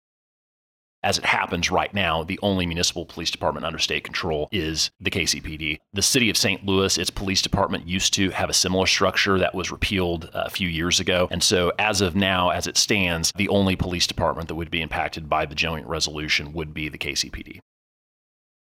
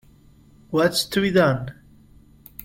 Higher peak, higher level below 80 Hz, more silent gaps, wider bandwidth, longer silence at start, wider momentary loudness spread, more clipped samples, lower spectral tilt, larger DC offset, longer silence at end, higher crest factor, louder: about the same, -6 dBFS vs -4 dBFS; first, -44 dBFS vs -52 dBFS; neither; about the same, 16.5 kHz vs 16.5 kHz; first, 1.05 s vs 0.7 s; second, 8 LU vs 16 LU; neither; second, -3 dB/octave vs -5 dB/octave; neither; first, 1.05 s vs 0 s; about the same, 18 dB vs 20 dB; about the same, -22 LUFS vs -21 LUFS